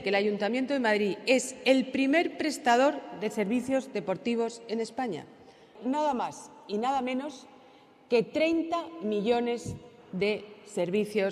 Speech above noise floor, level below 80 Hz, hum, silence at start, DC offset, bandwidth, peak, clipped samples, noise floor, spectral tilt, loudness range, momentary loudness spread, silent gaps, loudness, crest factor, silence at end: 28 dB; -68 dBFS; none; 0 s; under 0.1%; 14 kHz; -10 dBFS; under 0.1%; -56 dBFS; -4.5 dB/octave; 6 LU; 11 LU; none; -29 LUFS; 20 dB; 0 s